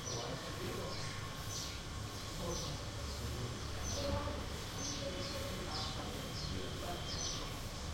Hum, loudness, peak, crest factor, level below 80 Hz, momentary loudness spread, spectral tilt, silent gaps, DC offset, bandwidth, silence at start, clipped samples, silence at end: none; -41 LUFS; -26 dBFS; 16 dB; -50 dBFS; 4 LU; -3.5 dB/octave; none; under 0.1%; 16.5 kHz; 0 s; under 0.1%; 0 s